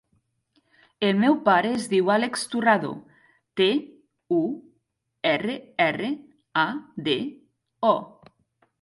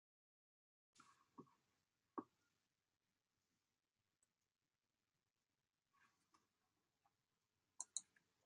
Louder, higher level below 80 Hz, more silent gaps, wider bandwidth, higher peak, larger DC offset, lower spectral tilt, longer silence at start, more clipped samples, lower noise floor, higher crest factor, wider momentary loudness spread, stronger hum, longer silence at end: first, -24 LUFS vs -54 LUFS; first, -72 dBFS vs under -90 dBFS; neither; first, 11.5 kHz vs 10 kHz; first, -6 dBFS vs -28 dBFS; neither; first, -5 dB/octave vs -1.5 dB/octave; about the same, 1 s vs 0.95 s; neither; second, -74 dBFS vs under -90 dBFS; second, 20 dB vs 38 dB; second, 11 LU vs 17 LU; neither; first, 0.75 s vs 0.45 s